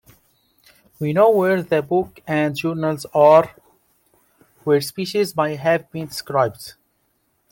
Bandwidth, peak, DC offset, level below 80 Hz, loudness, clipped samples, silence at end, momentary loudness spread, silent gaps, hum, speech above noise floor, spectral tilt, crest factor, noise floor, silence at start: 17 kHz; -2 dBFS; under 0.1%; -60 dBFS; -19 LUFS; under 0.1%; 0.8 s; 15 LU; none; none; 48 dB; -6 dB/octave; 18 dB; -67 dBFS; 1 s